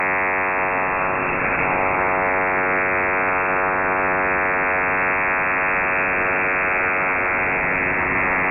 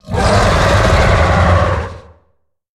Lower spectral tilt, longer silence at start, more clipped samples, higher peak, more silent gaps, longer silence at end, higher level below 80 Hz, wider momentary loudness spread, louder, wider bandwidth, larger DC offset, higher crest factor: about the same, -5 dB/octave vs -5.5 dB/octave; about the same, 0 s vs 0.05 s; neither; second, -6 dBFS vs 0 dBFS; neither; second, 0 s vs 0.75 s; second, -44 dBFS vs -20 dBFS; second, 1 LU vs 7 LU; second, -19 LUFS vs -12 LUFS; second, 3 kHz vs 13 kHz; neither; about the same, 12 dB vs 12 dB